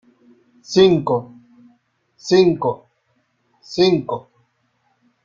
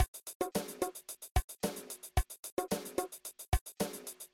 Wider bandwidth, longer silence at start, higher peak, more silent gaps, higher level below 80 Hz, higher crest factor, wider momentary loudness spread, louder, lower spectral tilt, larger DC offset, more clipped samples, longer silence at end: second, 7.4 kHz vs 17.5 kHz; first, 0.7 s vs 0 s; first, -2 dBFS vs -16 dBFS; second, none vs 0.08-0.14 s, 0.35-0.40 s, 1.31-1.35 s, 1.44-1.48 s, 2.39-2.43 s, 2.52-2.57 s, 3.61-3.66 s; second, -58 dBFS vs -42 dBFS; about the same, 18 dB vs 22 dB; first, 15 LU vs 7 LU; first, -17 LUFS vs -39 LUFS; first, -6 dB/octave vs -4.5 dB/octave; neither; neither; first, 1.05 s vs 0.1 s